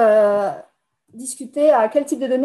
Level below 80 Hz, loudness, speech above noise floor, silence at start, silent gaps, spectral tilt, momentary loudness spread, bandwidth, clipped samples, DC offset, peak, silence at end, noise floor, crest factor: -74 dBFS; -18 LUFS; 42 dB; 0 s; none; -4.5 dB/octave; 16 LU; 12.5 kHz; under 0.1%; under 0.1%; -4 dBFS; 0 s; -59 dBFS; 14 dB